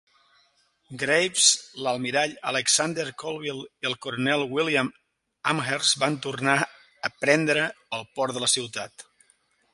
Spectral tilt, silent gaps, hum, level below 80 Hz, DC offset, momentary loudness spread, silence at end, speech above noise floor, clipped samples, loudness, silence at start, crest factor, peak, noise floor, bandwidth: -2 dB/octave; none; none; -70 dBFS; under 0.1%; 12 LU; 0.7 s; 40 dB; under 0.1%; -24 LUFS; 0.9 s; 22 dB; -4 dBFS; -66 dBFS; 11.5 kHz